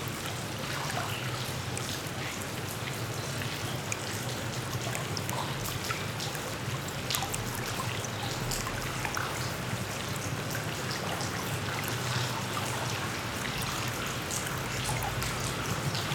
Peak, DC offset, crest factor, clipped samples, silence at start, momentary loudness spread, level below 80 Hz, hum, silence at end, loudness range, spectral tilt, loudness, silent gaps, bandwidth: -8 dBFS; under 0.1%; 26 dB; under 0.1%; 0 s; 3 LU; -52 dBFS; none; 0 s; 2 LU; -3.5 dB/octave; -33 LUFS; none; over 20 kHz